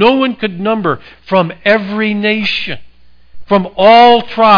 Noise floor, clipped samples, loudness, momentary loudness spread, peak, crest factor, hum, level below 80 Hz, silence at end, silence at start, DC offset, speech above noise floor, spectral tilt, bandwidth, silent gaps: -32 dBFS; under 0.1%; -11 LUFS; 12 LU; 0 dBFS; 12 dB; none; -46 dBFS; 0 s; 0 s; under 0.1%; 21 dB; -6.5 dB/octave; 5.2 kHz; none